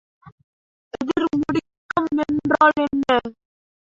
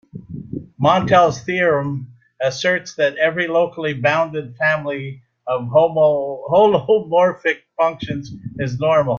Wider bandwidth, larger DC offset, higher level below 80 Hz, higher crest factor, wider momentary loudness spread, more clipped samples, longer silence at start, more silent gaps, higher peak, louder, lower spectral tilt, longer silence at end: about the same, 7.6 kHz vs 7.2 kHz; neither; about the same, -54 dBFS vs -54 dBFS; about the same, 20 dB vs 16 dB; second, 12 LU vs 15 LU; neither; about the same, 0.25 s vs 0.15 s; first, 0.32-0.38 s, 0.44-0.91 s, 1.77-1.89 s vs none; about the same, -2 dBFS vs -2 dBFS; second, -21 LUFS vs -18 LUFS; about the same, -6 dB/octave vs -6 dB/octave; first, 0.55 s vs 0 s